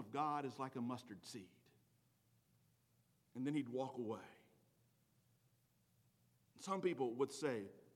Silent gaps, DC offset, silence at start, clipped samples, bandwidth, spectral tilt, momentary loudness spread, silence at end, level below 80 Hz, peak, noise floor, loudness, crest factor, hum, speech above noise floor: none; under 0.1%; 0 s; under 0.1%; 17 kHz; -5.5 dB/octave; 14 LU; 0.05 s; under -90 dBFS; -28 dBFS; -78 dBFS; -45 LUFS; 20 dB; 60 Hz at -80 dBFS; 34 dB